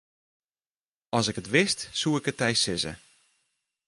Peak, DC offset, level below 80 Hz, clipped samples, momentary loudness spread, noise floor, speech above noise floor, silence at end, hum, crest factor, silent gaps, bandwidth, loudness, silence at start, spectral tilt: -8 dBFS; under 0.1%; -60 dBFS; under 0.1%; 7 LU; under -90 dBFS; over 63 dB; 0.9 s; none; 22 dB; none; 11.5 kHz; -26 LUFS; 1.15 s; -3.5 dB/octave